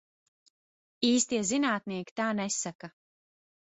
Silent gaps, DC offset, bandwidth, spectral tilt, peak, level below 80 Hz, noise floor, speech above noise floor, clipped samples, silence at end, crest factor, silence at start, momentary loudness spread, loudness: 2.11-2.16 s, 2.75-2.79 s; under 0.1%; 8.4 kHz; -3 dB/octave; -12 dBFS; -74 dBFS; under -90 dBFS; over 60 dB; under 0.1%; 0.9 s; 20 dB; 1 s; 12 LU; -29 LUFS